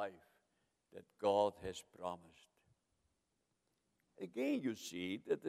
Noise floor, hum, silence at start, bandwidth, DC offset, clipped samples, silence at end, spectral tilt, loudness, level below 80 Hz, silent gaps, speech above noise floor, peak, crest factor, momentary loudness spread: -85 dBFS; none; 0 s; 15.5 kHz; under 0.1%; under 0.1%; 0 s; -5 dB/octave; -41 LUFS; -78 dBFS; none; 45 dB; -20 dBFS; 22 dB; 19 LU